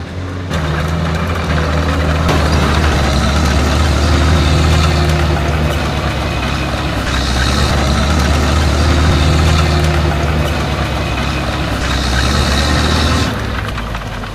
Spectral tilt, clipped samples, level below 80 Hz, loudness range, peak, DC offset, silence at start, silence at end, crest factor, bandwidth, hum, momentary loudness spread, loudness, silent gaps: -5 dB/octave; under 0.1%; -18 dBFS; 2 LU; 0 dBFS; under 0.1%; 0 s; 0 s; 14 dB; 14.5 kHz; none; 5 LU; -14 LUFS; none